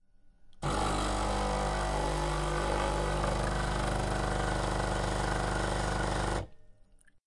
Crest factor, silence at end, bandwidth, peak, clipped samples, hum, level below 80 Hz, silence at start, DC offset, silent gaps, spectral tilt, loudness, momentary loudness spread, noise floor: 16 dB; 0.55 s; 11.5 kHz; -16 dBFS; under 0.1%; none; -36 dBFS; 0.25 s; under 0.1%; none; -5 dB/octave; -32 LUFS; 1 LU; -59 dBFS